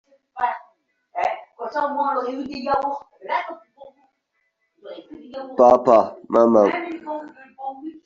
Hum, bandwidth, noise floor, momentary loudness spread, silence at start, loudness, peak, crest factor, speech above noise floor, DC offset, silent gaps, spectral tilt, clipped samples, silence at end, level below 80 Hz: none; 7.4 kHz; -73 dBFS; 24 LU; 0.35 s; -20 LUFS; -2 dBFS; 20 dB; 52 dB; under 0.1%; none; -4 dB/octave; under 0.1%; 0.1 s; -62 dBFS